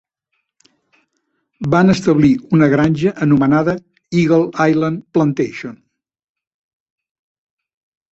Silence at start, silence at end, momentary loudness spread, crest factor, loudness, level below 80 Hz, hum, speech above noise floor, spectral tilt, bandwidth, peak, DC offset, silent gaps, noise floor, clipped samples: 1.6 s; 2.4 s; 10 LU; 16 dB; -15 LUFS; -50 dBFS; none; 58 dB; -7.5 dB/octave; 8 kHz; -2 dBFS; under 0.1%; none; -72 dBFS; under 0.1%